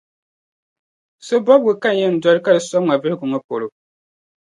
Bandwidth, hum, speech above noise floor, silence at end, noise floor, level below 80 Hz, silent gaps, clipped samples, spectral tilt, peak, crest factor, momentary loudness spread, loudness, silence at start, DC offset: 11 kHz; none; over 74 dB; 0.9 s; under -90 dBFS; -70 dBFS; 3.44-3.49 s; under 0.1%; -5.5 dB/octave; 0 dBFS; 18 dB; 11 LU; -17 LUFS; 1.25 s; under 0.1%